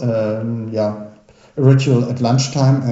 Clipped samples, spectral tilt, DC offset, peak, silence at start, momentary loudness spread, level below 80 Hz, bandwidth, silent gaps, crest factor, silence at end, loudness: under 0.1%; -7 dB/octave; under 0.1%; 0 dBFS; 0 s; 9 LU; -58 dBFS; 8 kHz; none; 16 dB; 0 s; -17 LUFS